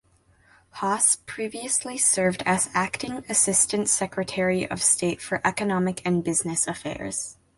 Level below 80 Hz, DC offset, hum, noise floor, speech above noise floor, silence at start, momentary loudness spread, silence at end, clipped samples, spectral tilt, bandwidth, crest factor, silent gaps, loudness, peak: -58 dBFS; under 0.1%; none; -60 dBFS; 35 dB; 0.75 s; 10 LU; 0.25 s; under 0.1%; -3 dB/octave; 12 kHz; 20 dB; none; -23 LUFS; -6 dBFS